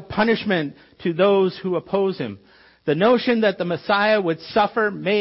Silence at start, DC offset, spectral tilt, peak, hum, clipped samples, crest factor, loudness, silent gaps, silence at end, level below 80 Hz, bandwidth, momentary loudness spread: 0 s; under 0.1%; -10 dB/octave; -6 dBFS; none; under 0.1%; 14 dB; -20 LUFS; none; 0 s; -58 dBFS; 5.8 kHz; 10 LU